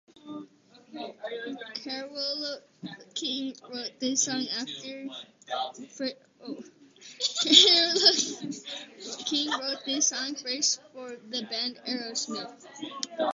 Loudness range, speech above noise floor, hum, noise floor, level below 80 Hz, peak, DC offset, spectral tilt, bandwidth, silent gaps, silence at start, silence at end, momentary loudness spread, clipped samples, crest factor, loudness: 12 LU; 27 dB; none; -56 dBFS; -80 dBFS; -2 dBFS; under 0.1%; -0.5 dB/octave; 8 kHz; none; 0.25 s; 0 s; 23 LU; under 0.1%; 28 dB; -26 LUFS